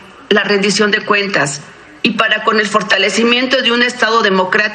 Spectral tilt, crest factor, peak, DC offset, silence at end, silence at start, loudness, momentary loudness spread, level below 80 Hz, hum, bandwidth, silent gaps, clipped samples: -3 dB/octave; 14 dB; 0 dBFS; under 0.1%; 0 s; 0 s; -12 LUFS; 5 LU; -58 dBFS; none; 10.5 kHz; none; under 0.1%